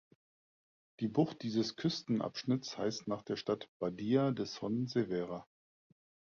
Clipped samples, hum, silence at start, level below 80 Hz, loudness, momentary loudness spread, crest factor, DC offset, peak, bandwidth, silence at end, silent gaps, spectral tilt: under 0.1%; none; 1 s; -72 dBFS; -36 LUFS; 7 LU; 20 dB; under 0.1%; -18 dBFS; 7.2 kHz; 0.85 s; 3.69-3.80 s; -6 dB/octave